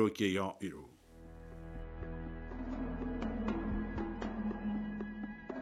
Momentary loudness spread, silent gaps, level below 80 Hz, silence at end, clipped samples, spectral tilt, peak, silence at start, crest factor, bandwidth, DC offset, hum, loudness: 16 LU; none; -48 dBFS; 0 s; under 0.1%; -6.5 dB/octave; -18 dBFS; 0 s; 20 dB; 14 kHz; under 0.1%; none; -40 LUFS